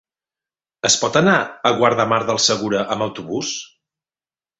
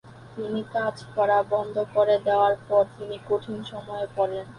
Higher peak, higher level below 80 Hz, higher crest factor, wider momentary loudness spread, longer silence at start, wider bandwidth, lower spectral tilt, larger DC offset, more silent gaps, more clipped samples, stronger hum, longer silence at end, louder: first, -2 dBFS vs -8 dBFS; about the same, -58 dBFS vs -62 dBFS; about the same, 18 dB vs 16 dB; second, 9 LU vs 13 LU; first, 0.85 s vs 0.05 s; second, 8.4 kHz vs 10.5 kHz; second, -3 dB/octave vs -6.5 dB/octave; neither; neither; neither; neither; first, 0.95 s vs 0 s; first, -18 LUFS vs -25 LUFS